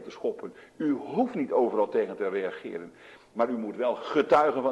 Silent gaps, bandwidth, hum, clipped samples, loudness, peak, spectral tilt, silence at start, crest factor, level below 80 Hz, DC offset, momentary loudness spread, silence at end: none; 11 kHz; none; under 0.1%; -28 LUFS; -10 dBFS; -6.5 dB/octave; 0 s; 18 dB; -70 dBFS; under 0.1%; 18 LU; 0 s